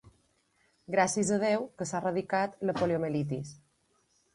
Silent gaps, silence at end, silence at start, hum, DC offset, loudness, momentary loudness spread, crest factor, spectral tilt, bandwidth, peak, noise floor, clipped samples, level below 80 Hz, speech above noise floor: none; 0.8 s; 0.05 s; none; under 0.1%; -30 LUFS; 8 LU; 20 dB; -5 dB/octave; 11.5 kHz; -12 dBFS; -72 dBFS; under 0.1%; -66 dBFS; 42 dB